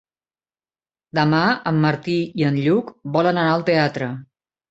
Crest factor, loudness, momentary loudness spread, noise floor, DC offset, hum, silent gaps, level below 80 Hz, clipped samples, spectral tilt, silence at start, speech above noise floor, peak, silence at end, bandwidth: 18 dB; -20 LUFS; 8 LU; under -90 dBFS; under 0.1%; none; none; -60 dBFS; under 0.1%; -7.5 dB/octave; 1.15 s; over 71 dB; -2 dBFS; 0.45 s; 7.8 kHz